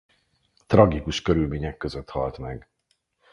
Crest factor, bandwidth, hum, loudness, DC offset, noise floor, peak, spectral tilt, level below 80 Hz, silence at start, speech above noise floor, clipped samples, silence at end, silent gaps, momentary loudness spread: 24 dB; 11 kHz; none; -23 LUFS; under 0.1%; -72 dBFS; 0 dBFS; -7 dB/octave; -40 dBFS; 0.7 s; 49 dB; under 0.1%; 0.75 s; none; 18 LU